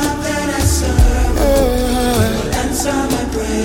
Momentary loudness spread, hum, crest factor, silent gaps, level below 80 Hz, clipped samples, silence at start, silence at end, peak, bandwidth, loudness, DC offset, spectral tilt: 4 LU; none; 14 dB; none; -18 dBFS; under 0.1%; 0 s; 0 s; -2 dBFS; 17 kHz; -16 LUFS; under 0.1%; -5 dB/octave